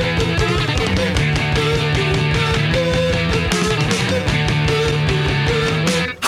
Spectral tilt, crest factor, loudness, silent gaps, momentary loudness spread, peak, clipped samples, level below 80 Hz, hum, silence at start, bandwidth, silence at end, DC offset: -5 dB/octave; 14 dB; -17 LUFS; none; 1 LU; -2 dBFS; under 0.1%; -30 dBFS; none; 0 s; 14 kHz; 0 s; under 0.1%